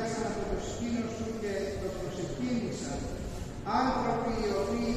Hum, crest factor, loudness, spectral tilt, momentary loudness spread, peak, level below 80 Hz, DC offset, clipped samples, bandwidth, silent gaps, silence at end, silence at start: none; 16 dB; -33 LUFS; -5.5 dB/octave; 7 LU; -16 dBFS; -46 dBFS; under 0.1%; under 0.1%; 14.5 kHz; none; 0 s; 0 s